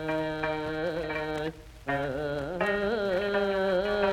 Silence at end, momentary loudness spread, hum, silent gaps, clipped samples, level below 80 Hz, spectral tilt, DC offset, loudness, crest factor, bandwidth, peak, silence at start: 0 s; 6 LU; none; none; under 0.1%; -50 dBFS; -6 dB/octave; under 0.1%; -30 LUFS; 16 dB; 16 kHz; -12 dBFS; 0 s